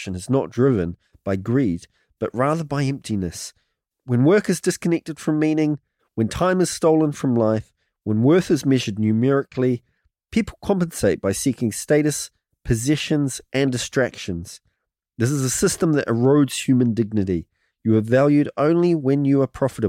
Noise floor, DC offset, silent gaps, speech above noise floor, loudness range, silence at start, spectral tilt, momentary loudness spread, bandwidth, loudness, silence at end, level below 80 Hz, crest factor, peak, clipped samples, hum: -76 dBFS; under 0.1%; none; 56 dB; 4 LU; 0 s; -6 dB/octave; 11 LU; 16.5 kHz; -21 LUFS; 0 s; -48 dBFS; 14 dB; -6 dBFS; under 0.1%; none